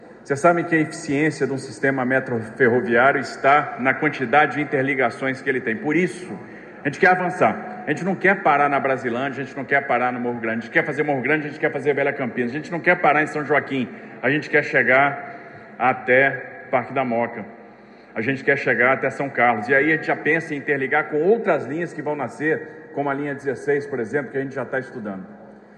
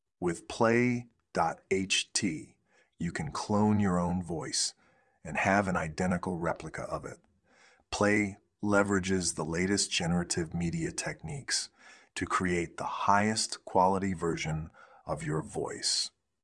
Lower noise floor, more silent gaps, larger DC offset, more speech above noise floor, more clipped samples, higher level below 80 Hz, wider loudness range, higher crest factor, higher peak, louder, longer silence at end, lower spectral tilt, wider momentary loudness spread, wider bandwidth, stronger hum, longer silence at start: second, -45 dBFS vs -64 dBFS; neither; neither; second, 24 dB vs 33 dB; neither; second, -66 dBFS vs -58 dBFS; about the same, 4 LU vs 2 LU; about the same, 18 dB vs 20 dB; first, -4 dBFS vs -10 dBFS; first, -20 LUFS vs -31 LUFS; second, 0.2 s vs 0.35 s; first, -6 dB/octave vs -4 dB/octave; about the same, 11 LU vs 11 LU; second, 10.5 kHz vs 12 kHz; neither; second, 0 s vs 0.2 s